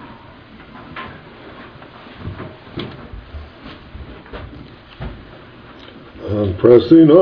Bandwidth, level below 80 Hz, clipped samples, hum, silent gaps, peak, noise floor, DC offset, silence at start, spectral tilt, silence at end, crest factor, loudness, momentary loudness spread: 5.2 kHz; -42 dBFS; under 0.1%; none; none; 0 dBFS; -40 dBFS; under 0.1%; 0.9 s; -10.5 dB/octave; 0 s; 18 dB; -12 LUFS; 28 LU